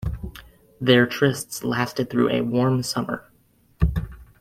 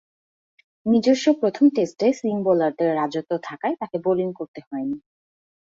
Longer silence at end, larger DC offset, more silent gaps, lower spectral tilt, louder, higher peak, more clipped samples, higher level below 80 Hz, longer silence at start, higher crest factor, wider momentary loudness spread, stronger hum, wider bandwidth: second, 0.15 s vs 0.7 s; neither; second, none vs 4.48-4.54 s, 4.67-4.71 s; about the same, -5.5 dB/octave vs -6 dB/octave; about the same, -22 LUFS vs -22 LUFS; first, -2 dBFS vs -6 dBFS; neither; first, -36 dBFS vs -66 dBFS; second, 0 s vs 0.85 s; first, 22 dB vs 16 dB; first, 15 LU vs 12 LU; neither; first, 16 kHz vs 7.8 kHz